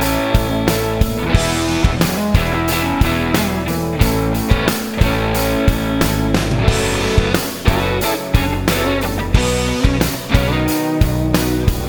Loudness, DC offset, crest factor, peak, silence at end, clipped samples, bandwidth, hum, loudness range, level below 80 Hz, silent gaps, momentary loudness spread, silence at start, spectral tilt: -17 LUFS; under 0.1%; 16 dB; 0 dBFS; 0 s; under 0.1%; over 20 kHz; none; 0 LU; -22 dBFS; none; 2 LU; 0 s; -5 dB/octave